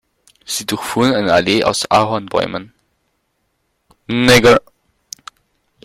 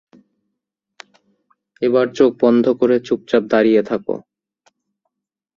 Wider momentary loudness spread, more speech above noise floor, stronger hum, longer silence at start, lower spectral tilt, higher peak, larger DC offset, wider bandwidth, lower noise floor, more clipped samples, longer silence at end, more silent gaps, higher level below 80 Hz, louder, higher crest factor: first, 22 LU vs 9 LU; second, 53 dB vs 63 dB; neither; second, 0.5 s vs 1.8 s; second, -4 dB/octave vs -6.5 dB/octave; about the same, 0 dBFS vs -2 dBFS; neither; first, 16.5 kHz vs 7.2 kHz; second, -67 dBFS vs -79 dBFS; neither; about the same, 1.25 s vs 1.35 s; neither; first, -46 dBFS vs -60 dBFS; about the same, -14 LUFS vs -16 LUFS; about the same, 16 dB vs 18 dB